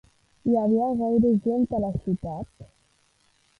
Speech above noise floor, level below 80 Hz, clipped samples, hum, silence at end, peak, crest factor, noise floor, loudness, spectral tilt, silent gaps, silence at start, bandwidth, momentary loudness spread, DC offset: 42 dB; -50 dBFS; under 0.1%; none; 0.95 s; -12 dBFS; 14 dB; -65 dBFS; -24 LUFS; -11 dB/octave; none; 0.45 s; 4.1 kHz; 13 LU; under 0.1%